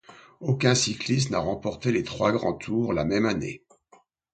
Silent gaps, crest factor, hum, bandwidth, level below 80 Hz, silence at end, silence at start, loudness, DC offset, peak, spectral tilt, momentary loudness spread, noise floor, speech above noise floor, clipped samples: none; 20 dB; none; 9.2 kHz; -52 dBFS; 0.75 s; 0.1 s; -25 LUFS; under 0.1%; -6 dBFS; -5 dB/octave; 9 LU; -60 dBFS; 35 dB; under 0.1%